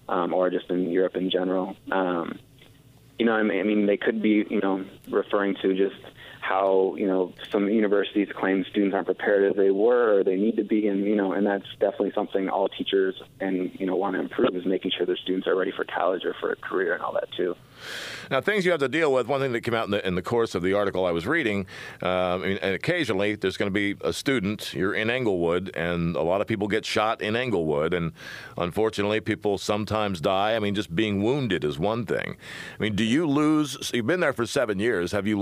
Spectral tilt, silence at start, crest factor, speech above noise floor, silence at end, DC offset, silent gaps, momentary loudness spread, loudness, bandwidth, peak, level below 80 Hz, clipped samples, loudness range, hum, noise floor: -5.5 dB/octave; 0.1 s; 18 dB; 28 dB; 0 s; under 0.1%; none; 7 LU; -25 LUFS; 15.5 kHz; -8 dBFS; -58 dBFS; under 0.1%; 3 LU; none; -53 dBFS